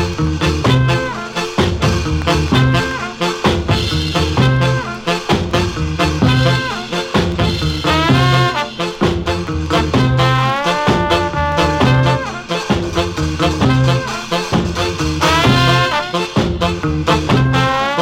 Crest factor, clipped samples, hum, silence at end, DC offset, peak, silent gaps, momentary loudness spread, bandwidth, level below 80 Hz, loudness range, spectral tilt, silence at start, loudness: 14 dB; under 0.1%; none; 0 s; under 0.1%; 0 dBFS; none; 7 LU; 15.5 kHz; -28 dBFS; 1 LU; -5.5 dB/octave; 0 s; -15 LUFS